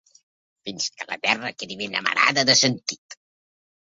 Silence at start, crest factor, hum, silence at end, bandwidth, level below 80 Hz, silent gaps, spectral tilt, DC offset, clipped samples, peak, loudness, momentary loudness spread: 0.65 s; 24 dB; none; 0.75 s; 7.8 kHz; -68 dBFS; 2.98-3.09 s; -1.5 dB/octave; under 0.1%; under 0.1%; -2 dBFS; -21 LUFS; 17 LU